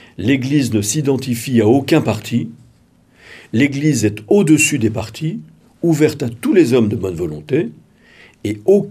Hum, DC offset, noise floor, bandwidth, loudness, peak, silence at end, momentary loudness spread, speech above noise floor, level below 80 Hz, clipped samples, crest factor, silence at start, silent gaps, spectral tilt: none; under 0.1%; -52 dBFS; 15.5 kHz; -16 LUFS; 0 dBFS; 0 s; 12 LU; 36 dB; -56 dBFS; under 0.1%; 16 dB; 0.2 s; none; -5.5 dB/octave